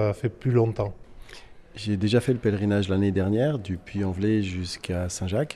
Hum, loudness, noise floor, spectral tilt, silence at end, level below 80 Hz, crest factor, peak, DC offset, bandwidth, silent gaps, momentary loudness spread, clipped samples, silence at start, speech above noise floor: none; -26 LUFS; -45 dBFS; -6.5 dB/octave; 0 s; -50 dBFS; 16 dB; -8 dBFS; under 0.1%; 12.5 kHz; none; 9 LU; under 0.1%; 0 s; 21 dB